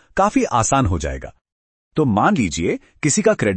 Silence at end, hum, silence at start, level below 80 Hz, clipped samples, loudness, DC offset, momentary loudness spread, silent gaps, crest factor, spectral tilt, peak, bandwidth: 0 s; none; 0.15 s; -36 dBFS; under 0.1%; -18 LUFS; under 0.1%; 9 LU; 1.41-1.45 s, 1.52-1.91 s; 18 dB; -5 dB/octave; 0 dBFS; 8.8 kHz